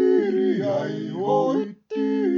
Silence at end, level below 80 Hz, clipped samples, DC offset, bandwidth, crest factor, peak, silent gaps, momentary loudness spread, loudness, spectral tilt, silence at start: 0 s; -78 dBFS; under 0.1%; under 0.1%; 7 kHz; 12 dB; -10 dBFS; none; 7 LU; -23 LUFS; -8 dB/octave; 0 s